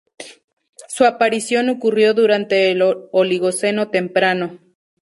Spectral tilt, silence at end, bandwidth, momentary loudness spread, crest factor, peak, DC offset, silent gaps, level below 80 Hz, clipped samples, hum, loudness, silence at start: -4 dB/octave; 0.5 s; 11.5 kHz; 13 LU; 16 dB; -2 dBFS; under 0.1%; 0.44-0.57 s, 0.69-0.73 s; -66 dBFS; under 0.1%; none; -17 LUFS; 0.2 s